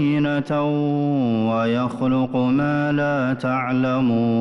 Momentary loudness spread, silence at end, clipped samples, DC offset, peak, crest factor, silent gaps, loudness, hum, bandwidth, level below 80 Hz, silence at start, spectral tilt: 2 LU; 0 s; under 0.1%; under 0.1%; -12 dBFS; 8 dB; none; -20 LUFS; none; 6.4 kHz; -54 dBFS; 0 s; -8.5 dB/octave